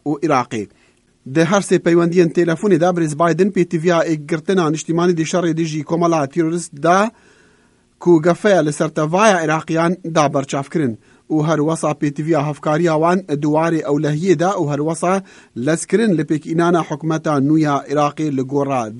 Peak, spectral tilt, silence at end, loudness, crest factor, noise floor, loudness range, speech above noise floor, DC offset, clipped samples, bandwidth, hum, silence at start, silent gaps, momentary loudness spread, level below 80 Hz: 0 dBFS; -6 dB/octave; 0 s; -17 LUFS; 16 dB; -55 dBFS; 2 LU; 39 dB; under 0.1%; under 0.1%; 11 kHz; none; 0.05 s; none; 7 LU; -60 dBFS